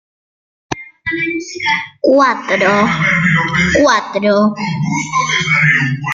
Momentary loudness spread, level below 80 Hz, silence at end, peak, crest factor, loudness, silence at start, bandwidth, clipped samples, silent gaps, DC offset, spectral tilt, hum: 8 LU; -44 dBFS; 0 s; 0 dBFS; 14 dB; -13 LUFS; 0.7 s; 7.6 kHz; under 0.1%; none; under 0.1%; -5 dB/octave; none